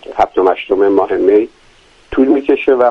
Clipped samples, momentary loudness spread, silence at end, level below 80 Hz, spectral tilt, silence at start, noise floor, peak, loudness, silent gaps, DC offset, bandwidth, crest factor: under 0.1%; 4 LU; 0 s; -42 dBFS; -6.5 dB/octave; 0.1 s; -46 dBFS; 0 dBFS; -13 LUFS; none; under 0.1%; 6.2 kHz; 12 dB